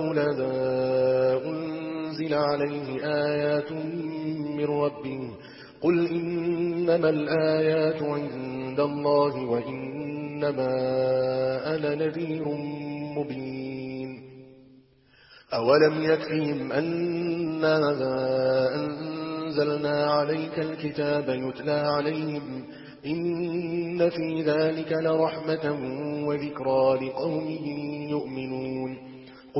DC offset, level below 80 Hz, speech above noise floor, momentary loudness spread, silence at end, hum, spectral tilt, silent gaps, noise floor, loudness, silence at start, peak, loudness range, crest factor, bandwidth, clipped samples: under 0.1%; -64 dBFS; 32 dB; 10 LU; 0 s; none; -10.5 dB/octave; none; -58 dBFS; -27 LUFS; 0 s; -8 dBFS; 4 LU; 20 dB; 5.8 kHz; under 0.1%